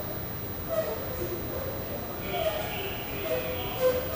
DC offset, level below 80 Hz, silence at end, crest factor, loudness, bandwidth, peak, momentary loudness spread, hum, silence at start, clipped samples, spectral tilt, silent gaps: under 0.1%; -46 dBFS; 0 s; 16 dB; -31 LUFS; 15.5 kHz; -14 dBFS; 6 LU; none; 0 s; under 0.1%; -5 dB/octave; none